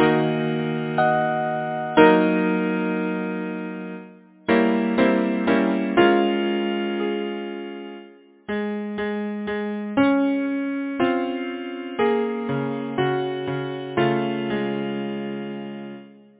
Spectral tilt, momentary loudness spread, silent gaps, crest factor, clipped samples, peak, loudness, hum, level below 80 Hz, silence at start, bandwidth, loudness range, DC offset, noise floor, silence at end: -10.5 dB/octave; 13 LU; none; 22 dB; under 0.1%; 0 dBFS; -23 LUFS; none; -60 dBFS; 0 s; 4 kHz; 5 LU; under 0.1%; -46 dBFS; 0.3 s